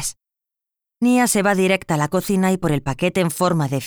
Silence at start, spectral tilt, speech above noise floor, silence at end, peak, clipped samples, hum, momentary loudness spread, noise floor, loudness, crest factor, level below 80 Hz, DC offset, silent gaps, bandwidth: 0 s; -5 dB/octave; 68 dB; 0 s; -4 dBFS; under 0.1%; none; 5 LU; -86 dBFS; -19 LUFS; 14 dB; -48 dBFS; under 0.1%; none; over 20 kHz